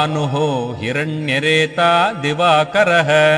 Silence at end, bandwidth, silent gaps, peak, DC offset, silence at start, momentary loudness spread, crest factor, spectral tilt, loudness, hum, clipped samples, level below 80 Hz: 0 s; 12.5 kHz; none; 0 dBFS; under 0.1%; 0 s; 7 LU; 14 dB; -5 dB/octave; -15 LUFS; none; under 0.1%; -56 dBFS